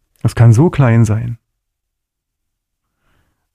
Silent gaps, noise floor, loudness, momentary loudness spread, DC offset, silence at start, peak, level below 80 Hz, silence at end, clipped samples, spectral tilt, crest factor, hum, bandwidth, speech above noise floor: none; -76 dBFS; -12 LUFS; 15 LU; under 0.1%; 0.25 s; 0 dBFS; -40 dBFS; 2.2 s; under 0.1%; -8 dB/octave; 14 dB; none; 10.5 kHz; 66 dB